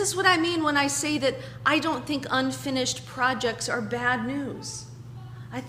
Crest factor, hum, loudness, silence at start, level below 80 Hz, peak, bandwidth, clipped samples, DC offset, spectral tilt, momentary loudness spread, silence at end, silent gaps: 20 dB; none; -25 LUFS; 0 s; -58 dBFS; -6 dBFS; 15.5 kHz; under 0.1%; under 0.1%; -3 dB/octave; 15 LU; 0 s; none